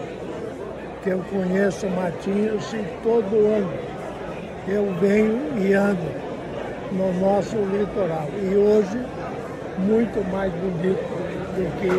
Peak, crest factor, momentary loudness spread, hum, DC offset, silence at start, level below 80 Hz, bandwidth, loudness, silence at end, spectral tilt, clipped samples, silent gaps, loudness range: -8 dBFS; 16 dB; 12 LU; none; under 0.1%; 0 s; -48 dBFS; 12 kHz; -23 LUFS; 0 s; -7.5 dB/octave; under 0.1%; none; 2 LU